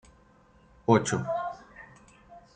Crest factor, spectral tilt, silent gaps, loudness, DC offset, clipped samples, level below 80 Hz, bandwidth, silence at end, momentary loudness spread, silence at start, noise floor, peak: 26 dB; -5.5 dB/octave; none; -28 LUFS; under 0.1%; under 0.1%; -62 dBFS; 9.4 kHz; 0.15 s; 24 LU; 0.9 s; -59 dBFS; -6 dBFS